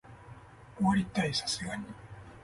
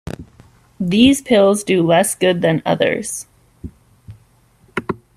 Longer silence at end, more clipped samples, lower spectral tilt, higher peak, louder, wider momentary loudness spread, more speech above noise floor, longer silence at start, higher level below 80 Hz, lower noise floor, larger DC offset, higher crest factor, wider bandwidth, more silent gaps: second, 0 s vs 0.2 s; neither; about the same, -4.5 dB/octave vs -4.5 dB/octave; second, -14 dBFS vs 0 dBFS; second, -31 LUFS vs -15 LUFS; about the same, 23 LU vs 23 LU; second, 20 dB vs 39 dB; about the same, 0.05 s vs 0.05 s; second, -56 dBFS vs -48 dBFS; about the same, -51 dBFS vs -53 dBFS; neither; about the same, 20 dB vs 16 dB; second, 11.5 kHz vs 14.5 kHz; neither